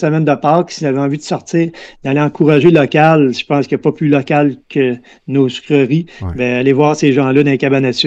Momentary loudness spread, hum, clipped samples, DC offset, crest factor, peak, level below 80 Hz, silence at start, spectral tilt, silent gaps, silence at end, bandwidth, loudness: 8 LU; none; under 0.1%; under 0.1%; 12 dB; 0 dBFS; -46 dBFS; 0 s; -6.5 dB/octave; none; 0 s; 8.2 kHz; -13 LUFS